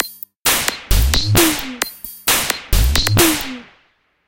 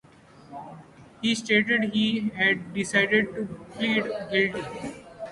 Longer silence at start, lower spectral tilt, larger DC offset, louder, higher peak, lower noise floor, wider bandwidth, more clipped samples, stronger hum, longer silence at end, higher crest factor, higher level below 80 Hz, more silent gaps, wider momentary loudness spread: second, 0 s vs 0.35 s; second, -3 dB/octave vs -4.5 dB/octave; neither; first, -16 LUFS vs -24 LUFS; first, 0 dBFS vs -8 dBFS; first, -59 dBFS vs -52 dBFS; first, 17.5 kHz vs 11.5 kHz; neither; neither; first, 0.65 s vs 0 s; about the same, 18 dB vs 20 dB; first, -22 dBFS vs -62 dBFS; first, 0.36-0.43 s vs none; second, 11 LU vs 20 LU